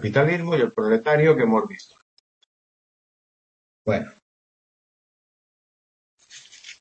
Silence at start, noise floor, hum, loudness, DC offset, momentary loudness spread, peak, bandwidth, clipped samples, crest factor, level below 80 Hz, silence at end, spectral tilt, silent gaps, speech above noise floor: 0 s; -47 dBFS; none; -21 LUFS; under 0.1%; 23 LU; -4 dBFS; 8.2 kHz; under 0.1%; 22 dB; -66 dBFS; 0.1 s; -7 dB/octave; 2.02-3.85 s, 4.22-6.18 s; 27 dB